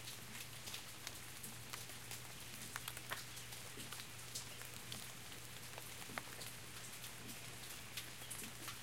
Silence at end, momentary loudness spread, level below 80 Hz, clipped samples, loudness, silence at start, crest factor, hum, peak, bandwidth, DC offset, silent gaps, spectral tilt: 0 s; 3 LU; -70 dBFS; under 0.1%; -49 LUFS; 0 s; 28 dB; none; -24 dBFS; 16.5 kHz; 0.1%; none; -2 dB/octave